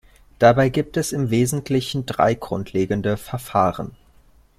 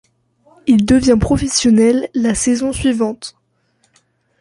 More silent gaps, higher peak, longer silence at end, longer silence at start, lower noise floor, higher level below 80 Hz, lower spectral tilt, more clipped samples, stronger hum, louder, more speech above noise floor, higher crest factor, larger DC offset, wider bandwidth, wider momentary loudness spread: neither; about the same, -2 dBFS vs -2 dBFS; second, 0.7 s vs 1.1 s; second, 0.4 s vs 0.65 s; second, -53 dBFS vs -61 dBFS; second, -48 dBFS vs -34 dBFS; about the same, -6 dB/octave vs -5 dB/octave; neither; neither; second, -21 LUFS vs -14 LUFS; second, 33 dB vs 48 dB; about the same, 18 dB vs 14 dB; neither; first, 15.5 kHz vs 11.5 kHz; about the same, 10 LU vs 10 LU